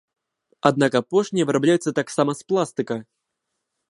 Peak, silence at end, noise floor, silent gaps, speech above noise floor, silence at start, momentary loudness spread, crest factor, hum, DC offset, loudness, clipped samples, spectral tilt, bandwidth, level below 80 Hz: 0 dBFS; 0.9 s; -79 dBFS; none; 58 dB; 0.65 s; 8 LU; 22 dB; none; under 0.1%; -22 LUFS; under 0.1%; -5.5 dB/octave; 11.5 kHz; -68 dBFS